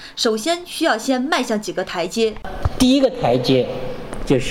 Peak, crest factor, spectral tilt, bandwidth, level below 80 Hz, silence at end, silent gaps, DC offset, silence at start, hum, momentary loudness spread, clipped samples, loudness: -6 dBFS; 14 dB; -4.5 dB/octave; 16.5 kHz; -36 dBFS; 0 s; none; under 0.1%; 0 s; none; 10 LU; under 0.1%; -19 LUFS